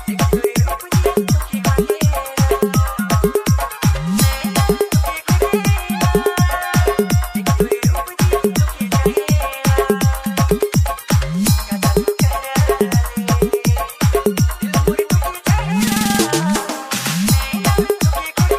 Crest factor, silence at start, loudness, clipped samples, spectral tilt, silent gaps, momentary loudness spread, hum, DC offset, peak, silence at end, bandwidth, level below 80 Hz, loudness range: 14 dB; 0 s; -17 LUFS; under 0.1%; -5.5 dB/octave; none; 2 LU; none; under 0.1%; -2 dBFS; 0 s; 16 kHz; -24 dBFS; 0 LU